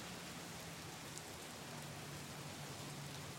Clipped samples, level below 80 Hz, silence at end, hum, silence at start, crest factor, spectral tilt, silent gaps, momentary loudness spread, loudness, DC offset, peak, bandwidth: under 0.1%; -72 dBFS; 0 s; none; 0 s; 24 dB; -3.5 dB/octave; none; 1 LU; -49 LUFS; under 0.1%; -26 dBFS; 16 kHz